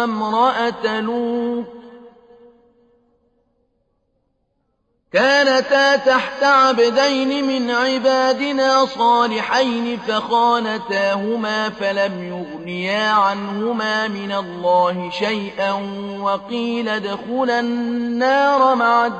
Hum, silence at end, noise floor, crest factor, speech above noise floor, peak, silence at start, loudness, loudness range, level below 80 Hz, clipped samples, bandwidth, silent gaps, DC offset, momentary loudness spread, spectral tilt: none; 0 s; -68 dBFS; 14 dB; 50 dB; -4 dBFS; 0 s; -18 LUFS; 7 LU; -60 dBFS; under 0.1%; 8.6 kHz; none; under 0.1%; 9 LU; -4 dB/octave